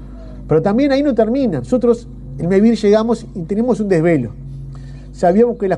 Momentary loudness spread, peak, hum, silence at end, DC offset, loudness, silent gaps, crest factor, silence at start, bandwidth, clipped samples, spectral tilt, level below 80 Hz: 19 LU; -2 dBFS; none; 0 s; under 0.1%; -15 LUFS; none; 14 dB; 0 s; 10 kHz; under 0.1%; -8 dB/octave; -36 dBFS